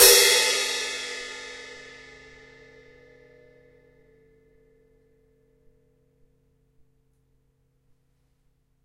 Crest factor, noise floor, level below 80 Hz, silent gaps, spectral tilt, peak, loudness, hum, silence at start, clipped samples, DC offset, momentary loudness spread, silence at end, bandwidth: 28 dB; -68 dBFS; -58 dBFS; none; 1.5 dB/octave; 0 dBFS; -20 LUFS; none; 0 s; under 0.1%; under 0.1%; 29 LU; 7.05 s; 16 kHz